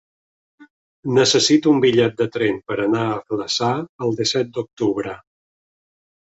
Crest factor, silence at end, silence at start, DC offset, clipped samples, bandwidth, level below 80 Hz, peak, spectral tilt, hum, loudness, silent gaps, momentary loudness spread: 16 dB; 1.2 s; 0.6 s; under 0.1%; under 0.1%; 8 kHz; -60 dBFS; -4 dBFS; -4.5 dB/octave; none; -19 LUFS; 0.70-1.03 s, 3.89-3.99 s, 4.73-4.77 s; 11 LU